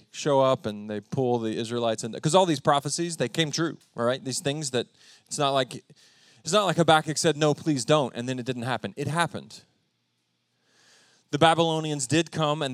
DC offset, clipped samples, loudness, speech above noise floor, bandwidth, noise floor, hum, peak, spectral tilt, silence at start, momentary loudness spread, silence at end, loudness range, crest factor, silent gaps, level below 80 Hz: under 0.1%; under 0.1%; -25 LUFS; 49 dB; 14.5 kHz; -74 dBFS; none; -4 dBFS; -4.5 dB/octave; 0.15 s; 10 LU; 0 s; 5 LU; 22 dB; none; -72 dBFS